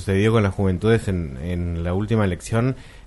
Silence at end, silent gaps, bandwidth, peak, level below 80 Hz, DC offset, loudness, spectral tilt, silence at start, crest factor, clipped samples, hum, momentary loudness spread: 0 s; none; 11.5 kHz; -4 dBFS; -38 dBFS; under 0.1%; -22 LUFS; -7 dB/octave; 0 s; 16 dB; under 0.1%; none; 8 LU